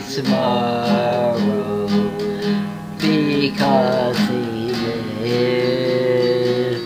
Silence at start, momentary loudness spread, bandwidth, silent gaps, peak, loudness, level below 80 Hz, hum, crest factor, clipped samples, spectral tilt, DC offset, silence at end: 0 s; 6 LU; 16 kHz; none; -4 dBFS; -19 LUFS; -54 dBFS; none; 14 dB; under 0.1%; -6.5 dB/octave; under 0.1%; 0 s